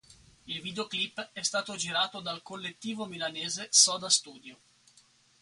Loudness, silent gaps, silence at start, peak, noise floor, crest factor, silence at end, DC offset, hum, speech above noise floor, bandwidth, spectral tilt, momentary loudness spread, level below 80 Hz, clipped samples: -29 LUFS; none; 0.1 s; -6 dBFS; -63 dBFS; 26 dB; 0.9 s; under 0.1%; none; 32 dB; 11.5 kHz; -0.5 dB/octave; 16 LU; -74 dBFS; under 0.1%